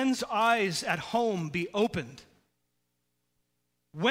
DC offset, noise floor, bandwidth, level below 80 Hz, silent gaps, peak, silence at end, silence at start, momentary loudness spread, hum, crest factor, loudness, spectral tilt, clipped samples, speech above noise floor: under 0.1%; -79 dBFS; 16 kHz; -66 dBFS; none; -10 dBFS; 0 s; 0 s; 11 LU; 60 Hz at -55 dBFS; 20 dB; -29 LUFS; -4.5 dB/octave; under 0.1%; 50 dB